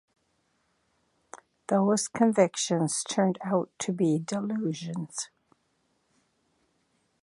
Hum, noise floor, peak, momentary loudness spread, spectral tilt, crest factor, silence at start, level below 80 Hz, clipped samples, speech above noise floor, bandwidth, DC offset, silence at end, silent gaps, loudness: none; -73 dBFS; -8 dBFS; 11 LU; -5 dB/octave; 22 dB; 1.35 s; -76 dBFS; under 0.1%; 46 dB; 11.5 kHz; under 0.1%; 1.95 s; none; -28 LUFS